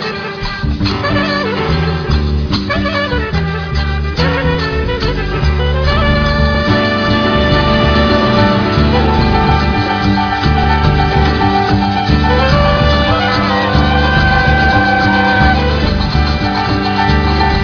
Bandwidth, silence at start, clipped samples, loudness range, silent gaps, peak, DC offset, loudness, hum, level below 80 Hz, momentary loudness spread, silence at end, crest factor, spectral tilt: 5.4 kHz; 0 s; under 0.1%; 4 LU; none; 0 dBFS; under 0.1%; -12 LUFS; none; -18 dBFS; 5 LU; 0 s; 12 dB; -7 dB/octave